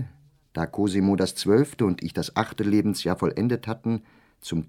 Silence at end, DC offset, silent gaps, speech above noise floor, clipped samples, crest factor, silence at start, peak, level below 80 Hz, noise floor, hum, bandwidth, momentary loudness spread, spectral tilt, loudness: 0.05 s; under 0.1%; none; 25 dB; under 0.1%; 20 dB; 0 s; -4 dBFS; -54 dBFS; -49 dBFS; none; 16.5 kHz; 10 LU; -6 dB/octave; -25 LUFS